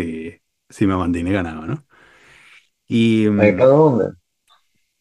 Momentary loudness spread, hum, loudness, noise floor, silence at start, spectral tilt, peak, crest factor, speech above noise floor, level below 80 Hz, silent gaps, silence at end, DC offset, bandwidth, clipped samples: 17 LU; none; -17 LUFS; -60 dBFS; 0 s; -8 dB/octave; 0 dBFS; 18 dB; 44 dB; -48 dBFS; none; 0.9 s; under 0.1%; 11 kHz; under 0.1%